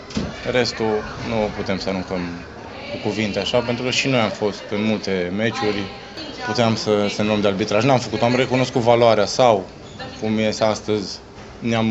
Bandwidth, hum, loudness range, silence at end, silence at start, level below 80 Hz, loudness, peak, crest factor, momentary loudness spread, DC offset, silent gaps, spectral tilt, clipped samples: 8.2 kHz; none; 5 LU; 0 s; 0 s; -46 dBFS; -20 LUFS; -2 dBFS; 20 dB; 14 LU; under 0.1%; none; -5 dB/octave; under 0.1%